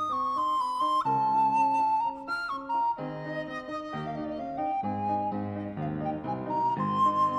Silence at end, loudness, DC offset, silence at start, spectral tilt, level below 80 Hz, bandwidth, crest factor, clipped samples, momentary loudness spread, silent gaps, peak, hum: 0 s; -29 LUFS; under 0.1%; 0 s; -6.5 dB/octave; -62 dBFS; 10.5 kHz; 12 dB; under 0.1%; 10 LU; none; -16 dBFS; none